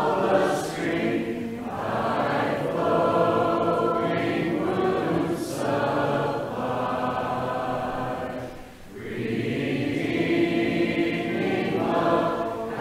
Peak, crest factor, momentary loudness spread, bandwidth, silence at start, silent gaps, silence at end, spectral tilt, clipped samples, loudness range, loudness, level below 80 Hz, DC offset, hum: -8 dBFS; 16 dB; 8 LU; 16 kHz; 0 s; none; 0 s; -6.5 dB/octave; under 0.1%; 5 LU; -25 LUFS; -52 dBFS; under 0.1%; none